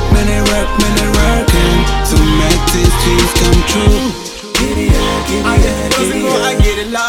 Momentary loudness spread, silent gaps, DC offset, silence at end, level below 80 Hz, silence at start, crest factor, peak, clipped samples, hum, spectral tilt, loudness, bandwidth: 4 LU; none; under 0.1%; 0 s; -14 dBFS; 0 s; 10 dB; 0 dBFS; under 0.1%; none; -4.5 dB/octave; -12 LUFS; 17 kHz